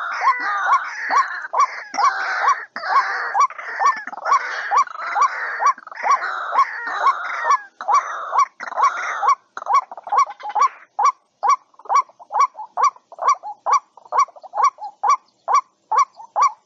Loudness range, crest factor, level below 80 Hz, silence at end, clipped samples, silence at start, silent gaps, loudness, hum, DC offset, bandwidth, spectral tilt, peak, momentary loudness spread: 1 LU; 14 dB; -84 dBFS; 0.1 s; under 0.1%; 0 s; none; -20 LUFS; none; under 0.1%; 7.6 kHz; 1.5 dB/octave; -6 dBFS; 3 LU